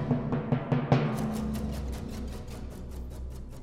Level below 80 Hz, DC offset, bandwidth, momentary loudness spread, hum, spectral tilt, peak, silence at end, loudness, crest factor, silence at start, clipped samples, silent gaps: -40 dBFS; under 0.1%; 15.5 kHz; 15 LU; none; -7.5 dB/octave; -8 dBFS; 0 s; -32 LUFS; 22 dB; 0 s; under 0.1%; none